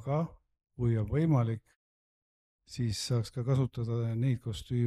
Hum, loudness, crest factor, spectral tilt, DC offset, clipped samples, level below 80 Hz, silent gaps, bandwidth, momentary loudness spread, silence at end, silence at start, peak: none; -32 LUFS; 14 dB; -7 dB/octave; under 0.1%; under 0.1%; -54 dBFS; 1.76-2.59 s; 12.5 kHz; 8 LU; 0 s; 0 s; -18 dBFS